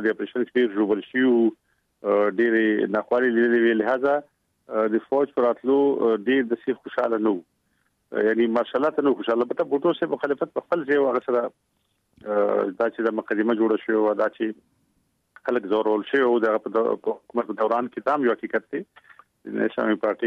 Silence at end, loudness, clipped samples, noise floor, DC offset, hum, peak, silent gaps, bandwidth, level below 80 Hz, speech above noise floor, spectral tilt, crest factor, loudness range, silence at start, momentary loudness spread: 0 s; -23 LUFS; under 0.1%; -70 dBFS; under 0.1%; none; -10 dBFS; none; 5.2 kHz; -74 dBFS; 48 dB; -7.5 dB/octave; 14 dB; 3 LU; 0 s; 8 LU